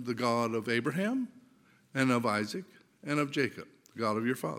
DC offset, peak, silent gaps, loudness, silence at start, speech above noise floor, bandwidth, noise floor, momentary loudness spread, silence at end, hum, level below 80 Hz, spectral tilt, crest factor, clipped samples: under 0.1%; -12 dBFS; none; -32 LUFS; 0 s; 32 dB; 16.5 kHz; -64 dBFS; 13 LU; 0 s; none; -80 dBFS; -5.5 dB/octave; 20 dB; under 0.1%